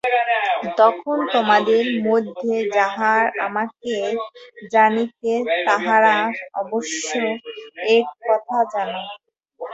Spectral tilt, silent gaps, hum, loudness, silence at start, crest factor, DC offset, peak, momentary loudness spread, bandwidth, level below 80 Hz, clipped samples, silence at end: -3.5 dB/octave; none; none; -19 LUFS; 0.05 s; 16 dB; under 0.1%; -2 dBFS; 11 LU; 8 kHz; -70 dBFS; under 0.1%; 0 s